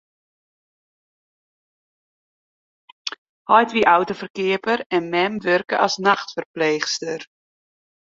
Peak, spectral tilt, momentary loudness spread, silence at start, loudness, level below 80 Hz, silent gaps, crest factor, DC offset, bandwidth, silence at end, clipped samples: 0 dBFS; -3.5 dB/octave; 15 LU; 3.05 s; -20 LUFS; -66 dBFS; 3.18-3.45 s, 4.30-4.34 s, 4.86-4.90 s, 6.46-6.54 s; 22 dB; under 0.1%; 7.8 kHz; 0.8 s; under 0.1%